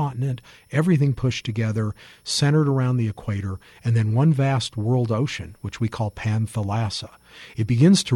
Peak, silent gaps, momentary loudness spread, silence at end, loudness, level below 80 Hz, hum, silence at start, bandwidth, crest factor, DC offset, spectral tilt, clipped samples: -6 dBFS; none; 12 LU; 0 s; -23 LUFS; -50 dBFS; none; 0 s; 16.5 kHz; 16 dB; under 0.1%; -6 dB/octave; under 0.1%